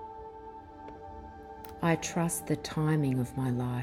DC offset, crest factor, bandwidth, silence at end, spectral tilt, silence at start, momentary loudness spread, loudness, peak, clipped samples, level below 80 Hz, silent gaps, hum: under 0.1%; 18 dB; 17 kHz; 0 s; -6 dB/octave; 0 s; 18 LU; -31 LUFS; -14 dBFS; under 0.1%; -56 dBFS; none; none